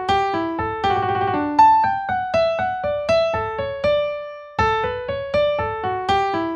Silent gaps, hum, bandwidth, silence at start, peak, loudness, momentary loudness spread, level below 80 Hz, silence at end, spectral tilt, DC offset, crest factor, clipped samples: none; none; 9.4 kHz; 0 s; -2 dBFS; -20 LUFS; 9 LU; -44 dBFS; 0 s; -5.5 dB/octave; under 0.1%; 18 dB; under 0.1%